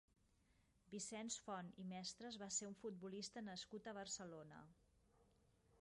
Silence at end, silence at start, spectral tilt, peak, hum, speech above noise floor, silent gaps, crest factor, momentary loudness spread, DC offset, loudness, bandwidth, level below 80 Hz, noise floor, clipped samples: 0 s; 0.85 s; -3 dB/octave; -34 dBFS; none; 26 dB; none; 20 dB; 10 LU; under 0.1%; -51 LUFS; 11.5 kHz; -82 dBFS; -79 dBFS; under 0.1%